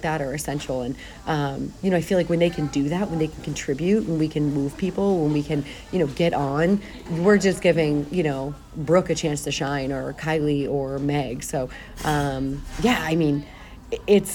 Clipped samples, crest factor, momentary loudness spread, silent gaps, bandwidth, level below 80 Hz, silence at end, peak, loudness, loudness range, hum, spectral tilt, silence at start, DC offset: under 0.1%; 18 dB; 9 LU; none; 18.5 kHz; -42 dBFS; 0 s; -4 dBFS; -24 LUFS; 3 LU; none; -6 dB/octave; 0 s; under 0.1%